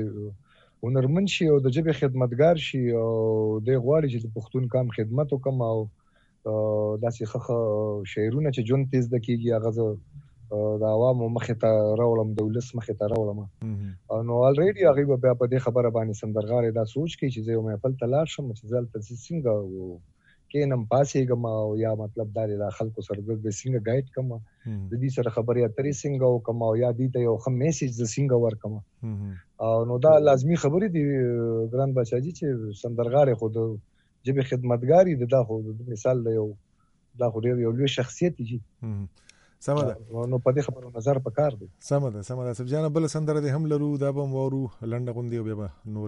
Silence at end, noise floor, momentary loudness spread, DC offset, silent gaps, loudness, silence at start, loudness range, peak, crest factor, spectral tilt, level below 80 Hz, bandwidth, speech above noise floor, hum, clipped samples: 0 s; -65 dBFS; 12 LU; under 0.1%; none; -25 LUFS; 0 s; 5 LU; -6 dBFS; 18 dB; -7.5 dB/octave; -58 dBFS; 9.8 kHz; 40 dB; none; under 0.1%